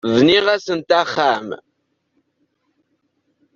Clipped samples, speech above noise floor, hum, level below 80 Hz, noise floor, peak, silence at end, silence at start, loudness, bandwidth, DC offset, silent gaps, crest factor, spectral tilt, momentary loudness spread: under 0.1%; 53 dB; none; -60 dBFS; -69 dBFS; -2 dBFS; 2 s; 0.05 s; -16 LUFS; 7.4 kHz; under 0.1%; none; 18 dB; -5 dB/octave; 15 LU